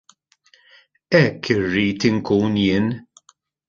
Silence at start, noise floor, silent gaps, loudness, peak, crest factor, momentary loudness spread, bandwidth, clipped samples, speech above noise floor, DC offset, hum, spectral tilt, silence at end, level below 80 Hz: 1.1 s; -58 dBFS; none; -19 LUFS; 0 dBFS; 20 dB; 5 LU; 7.4 kHz; under 0.1%; 40 dB; under 0.1%; none; -6.5 dB/octave; 0.65 s; -50 dBFS